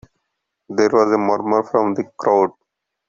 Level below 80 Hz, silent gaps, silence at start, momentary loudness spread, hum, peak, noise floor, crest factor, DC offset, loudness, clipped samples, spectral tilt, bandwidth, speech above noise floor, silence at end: -62 dBFS; none; 0.7 s; 7 LU; none; -2 dBFS; -76 dBFS; 18 dB; under 0.1%; -18 LUFS; under 0.1%; -6.5 dB/octave; 7.4 kHz; 59 dB; 0.6 s